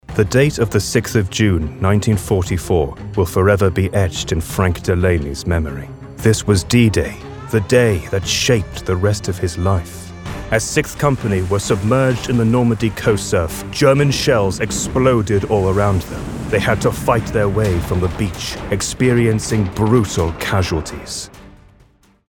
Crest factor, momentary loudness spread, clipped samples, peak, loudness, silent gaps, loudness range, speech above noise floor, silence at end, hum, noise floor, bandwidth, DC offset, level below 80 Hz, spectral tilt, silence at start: 16 dB; 8 LU; under 0.1%; 0 dBFS; -17 LUFS; none; 2 LU; 35 dB; 0.8 s; none; -52 dBFS; 18 kHz; under 0.1%; -32 dBFS; -5.5 dB/octave; 0.1 s